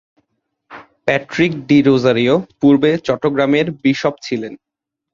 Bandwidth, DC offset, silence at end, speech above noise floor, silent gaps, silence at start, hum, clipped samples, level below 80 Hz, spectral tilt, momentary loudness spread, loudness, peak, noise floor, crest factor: 7.4 kHz; under 0.1%; 0.6 s; 56 dB; none; 0.7 s; none; under 0.1%; -54 dBFS; -6.5 dB/octave; 11 LU; -15 LUFS; 0 dBFS; -71 dBFS; 16 dB